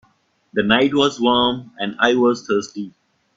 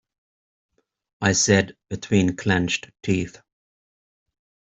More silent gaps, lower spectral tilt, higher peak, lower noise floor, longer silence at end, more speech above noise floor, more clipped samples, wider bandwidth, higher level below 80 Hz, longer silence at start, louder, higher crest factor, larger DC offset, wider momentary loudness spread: neither; about the same, -4.5 dB/octave vs -4 dB/octave; first, 0 dBFS vs -4 dBFS; second, -61 dBFS vs under -90 dBFS; second, 0.45 s vs 1.4 s; second, 43 dB vs over 68 dB; neither; about the same, 7.8 kHz vs 8.2 kHz; about the same, -56 dBFS vs -56 dBFS; second, 0.55 s vs 1.2 s; first, -18 LUFS vs -22 LUFS; about the same, 18 dB vs 22 dB; neither; about the same, 13 LU vs 11 LU